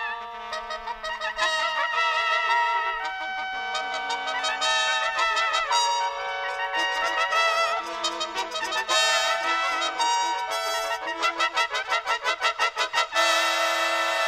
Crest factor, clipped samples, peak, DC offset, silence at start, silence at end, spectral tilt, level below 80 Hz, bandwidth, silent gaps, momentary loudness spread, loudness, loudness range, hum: 18 dB; under 0.1%; -8 dBFS; under 0.1%; 0 s; 0 s; 1.5 dB/octave; -60 dBFS; 16 kHz; none; 8 LU; -24 LUFS; 2 LU; none